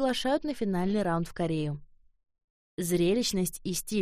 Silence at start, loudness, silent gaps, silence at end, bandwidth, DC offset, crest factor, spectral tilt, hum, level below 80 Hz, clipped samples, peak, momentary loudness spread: 0 s; -29 LUFS; 2.44-2.78 s; 0 s; 15.5 kHz; under 0.1%; 14 dB; -5 dB/octave; none; -50 dBFS; under 0.1%; -16 dBFS; 9 LU